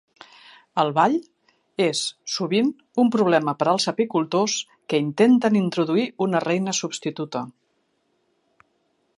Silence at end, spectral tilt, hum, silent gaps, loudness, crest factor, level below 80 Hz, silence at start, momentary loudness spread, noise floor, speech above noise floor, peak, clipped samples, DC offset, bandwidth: 1.65 s; -4.5 dB/octave; none; none; -22 LUFS; 18 dB; -74 dBFS; 0.75 s; 11 LU; -70 dBFS; 48 dB; -4 dBFS; under 0.1%; under 0.1%; 11.5 kHz